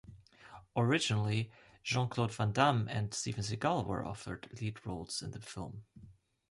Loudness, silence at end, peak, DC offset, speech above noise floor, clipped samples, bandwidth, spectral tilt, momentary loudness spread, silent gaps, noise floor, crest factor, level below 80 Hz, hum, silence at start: -35 LUFS; 0.4 s; -16 dBFS; under 0.1%; 22 dB; under 0.1%; 11.5 kHz; -5 dB/octave; 15 LU; none; -57 dBFS; 20 dB; -60 dBFS; none; 0.1 s